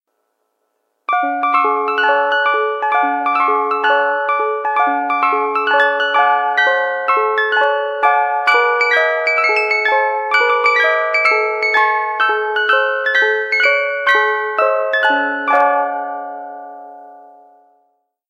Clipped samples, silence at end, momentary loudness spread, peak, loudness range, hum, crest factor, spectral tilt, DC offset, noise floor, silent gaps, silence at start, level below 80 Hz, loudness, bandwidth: under 0.1%; 1.05 s; 4 LU; 0 dBFS; 3 LU; none; 14 dB; -0.5 dB/octave; under 0.1%; -69 dBFS; none; 1.1 s; -78 dBFS; -14 LUFS; 11.5 kHz